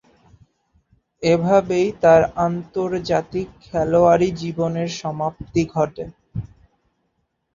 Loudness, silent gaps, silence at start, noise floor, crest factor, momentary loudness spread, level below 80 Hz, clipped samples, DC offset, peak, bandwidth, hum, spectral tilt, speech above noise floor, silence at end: -19 LUFS; none; 1.2 s; -71 dBFS; 18 dB; 14 LU; -48 dBFS; under 0.1%; under 0.1%; -2 dBFS; 7.4 kHz; none; -6.5 dB/octave; 52 dB; 1.1 s